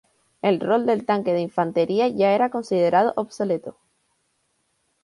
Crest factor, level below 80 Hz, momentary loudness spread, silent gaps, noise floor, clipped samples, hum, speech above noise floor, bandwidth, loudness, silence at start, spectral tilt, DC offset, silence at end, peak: 16 dB; -68 dBFS; 7 LU; none; -70 dBFS; under 0.1%; none; 49 dB; 11.5 kHz; -22 LUFS; 0.45 s; -6.5 dB/octave; under 0.1%; 1.35 s; -6 dBFS